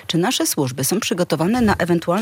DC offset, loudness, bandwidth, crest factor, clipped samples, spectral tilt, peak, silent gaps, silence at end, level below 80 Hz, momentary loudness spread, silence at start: under 0.1%; -19 LUFS; 17 kHz; 14 dB; under 0.1%; -4.5 dB/octave; -4 dBFS; none; 0 s; -46 dBFS; 3 LU; 0.05 s